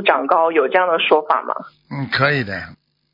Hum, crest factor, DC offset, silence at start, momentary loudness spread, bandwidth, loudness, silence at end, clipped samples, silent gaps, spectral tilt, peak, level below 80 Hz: none; 18 dB; under 0.1%; 0 s; 14 LU; 5.4 kHz; -17 LUFS; 0.4 s; under 0.1%; none; -7.5 dB/octave; 0 dBFS; -60 dBFS